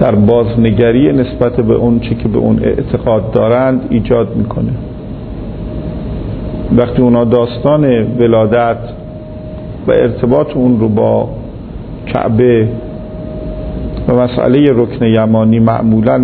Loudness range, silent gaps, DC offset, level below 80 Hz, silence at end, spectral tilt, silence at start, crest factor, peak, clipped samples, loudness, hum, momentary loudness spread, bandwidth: 4 LU; none; under 0.1%; -28 dBFS; 0 s; -12 dB/octave; 0 s; 12 dB; 0 dBFS; under 0.1%; -12 LUFS; none; 15 LU; 4.5 kHz